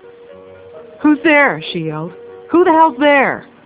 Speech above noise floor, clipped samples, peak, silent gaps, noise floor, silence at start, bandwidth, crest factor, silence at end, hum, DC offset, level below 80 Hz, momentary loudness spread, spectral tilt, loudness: 25 dB; under 0.1%; 0 dBFS; none; -38 dBFS; 0.3 s; 4 kHz; 14 dB; 0.25 s; none; under 0.1%; -56 dBFS; 13 LU; -9 dB/octave; -13 LUFS